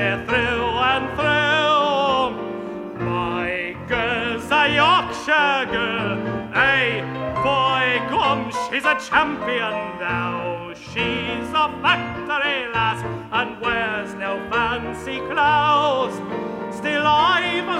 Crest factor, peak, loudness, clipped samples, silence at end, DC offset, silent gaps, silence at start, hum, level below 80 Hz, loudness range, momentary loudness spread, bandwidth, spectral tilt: 18 dB; -4 dBFS; -20 LUFS; under 0.1%; 0 s; under 0.1%; none; 0 s; none; -46 dBFS; 3 LU; 10 LU; 14 kHz; -4.5 dB/octave